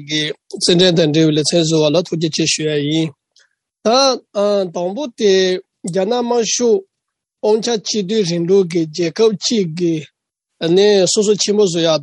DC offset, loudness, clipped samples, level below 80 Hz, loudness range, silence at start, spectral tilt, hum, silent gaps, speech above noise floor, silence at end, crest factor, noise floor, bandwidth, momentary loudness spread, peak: under 0.1%; -15 LUFS; under 0.1%; -62 dBFS; 2 LU; 0 s; -4 dB/octave; none; none; 63 dB; 0 s; 14 dB; -78 dBFS; 11.5 kHz; 9 LU; -2 dBFS